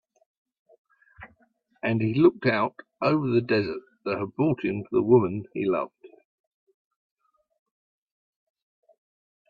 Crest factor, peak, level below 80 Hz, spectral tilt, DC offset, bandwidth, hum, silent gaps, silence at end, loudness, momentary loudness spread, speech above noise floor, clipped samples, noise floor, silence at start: 22 dB; -6 dBFS; -66 dBFS; -10 dB/octave; under 0.1%; 5 kHz; none; none; 3.4 s; -25 LUFS; 11 LU; 42 dB; under 0.1%; -66 dBFS; 1.2 s